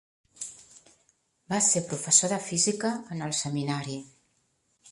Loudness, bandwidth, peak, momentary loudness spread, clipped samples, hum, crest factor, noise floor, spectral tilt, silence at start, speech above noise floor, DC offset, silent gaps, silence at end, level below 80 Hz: -26 LUFS; 11.5 kHz; -6 dBFS; 19 LU; under 0.1%; none; 24 dB; -72 dBFS; -3 dB/octave; 0.4 s; 44 dB; under 0.1%; none; 0 s; -70 dBFS